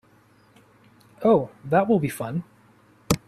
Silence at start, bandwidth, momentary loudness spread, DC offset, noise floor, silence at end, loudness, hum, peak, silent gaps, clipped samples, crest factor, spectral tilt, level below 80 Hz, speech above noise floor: 1.2 s; 15.5 kHz; 10 LU; under 0.1%; -57 dBFS; 0.1 s; -23 LUFS; none; -4 dBFS; none; under 0.1%; 20 dB; -6 dB/octave; -52 dBFS; 36 dB